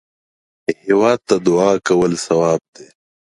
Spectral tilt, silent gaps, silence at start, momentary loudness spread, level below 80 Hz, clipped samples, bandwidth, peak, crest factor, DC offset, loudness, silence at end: -5.5 dB/octave; 2.68-2.73 s; 0.7 s; 9 LU; -54 dBFS; under 0.1%; 11.5 kHz; 0 dBFS; 16 dB; under 0.1%; -16 LUFS; 0.5 s